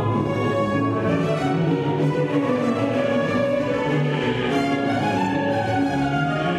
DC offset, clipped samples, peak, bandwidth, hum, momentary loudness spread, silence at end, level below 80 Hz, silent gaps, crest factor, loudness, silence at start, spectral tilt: under 0.1%; under 0.1%; -8 dBFS; 12 kHz; none; 1 LU; 0 s; -50 dBFS; none; 12 dB; -22 LUFS; 0 s; -7 dB/octave